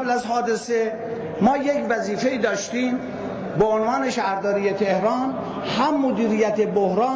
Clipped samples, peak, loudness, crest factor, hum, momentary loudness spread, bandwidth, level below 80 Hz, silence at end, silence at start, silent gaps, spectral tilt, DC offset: under 0.1%; -8 dBFS; -22 LUFS; 14 dB; none; 7 LU; 8 kHz; -56 dBFS; 0 s; 0 s; none; -5.5 dB/octave; under 0.1%